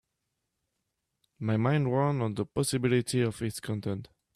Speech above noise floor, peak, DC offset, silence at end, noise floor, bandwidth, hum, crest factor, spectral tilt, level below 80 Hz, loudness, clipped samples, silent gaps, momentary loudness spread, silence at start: 54 dB; -14 dBFS; under 0.1%; 0.3 s; -83 dBFS; 14 kHz; none; 16 dB; -6 dB/octave; -62 dBFS; -29 LUFS; under 0.1%; none; 9 LU; 1.4 s